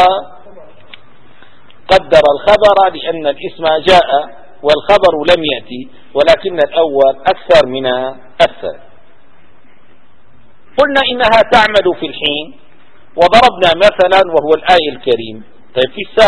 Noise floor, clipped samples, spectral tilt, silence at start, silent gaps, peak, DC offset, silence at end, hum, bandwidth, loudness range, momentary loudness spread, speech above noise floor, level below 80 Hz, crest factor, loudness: -50 dBFS; 1%; -4.5 dB/octave; 0 s; none; 0 dBFS; 3%; 0 s; none; 11 kHz; 5 LU; 13 LU; 39 dB; -40 dBFS; 12 dB; -11 LUFS